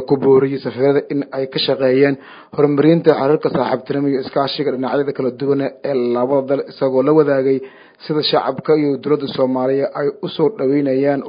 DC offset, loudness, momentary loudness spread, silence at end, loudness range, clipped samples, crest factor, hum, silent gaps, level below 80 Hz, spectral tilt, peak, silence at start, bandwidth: under 0.1%; -17 LUFS; 8 LU; 0 s; 3 LU; under 0.1%; 16 dB; none; none; -62 dBFS; -10 dB/octave; 0 dBFS; 0 s; 5.2 kHz